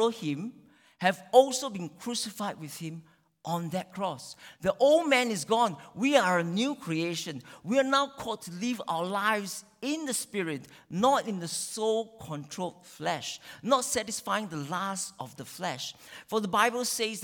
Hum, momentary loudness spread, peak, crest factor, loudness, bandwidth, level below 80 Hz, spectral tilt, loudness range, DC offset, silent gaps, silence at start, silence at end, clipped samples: none; 15 LU; -6 dBFS; 24 dB; -29 LUFS; 19 kHz; -70 dBFS; -3.5 dB/octave; 5 LU; under 0.1%; none; 0 s; 0 s; under 0.1%